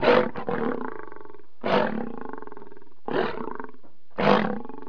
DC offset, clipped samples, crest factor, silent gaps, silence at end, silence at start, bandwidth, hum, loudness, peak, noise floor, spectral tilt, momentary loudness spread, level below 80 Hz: 3%; under 0.1%; 26 dB; none; 0.05 s; 0 s; 5.4 kHz; none; -26 LUFS; -2 dBFS; -54 dBFS; -7 dB/octave; 22 LU; -60 dBFS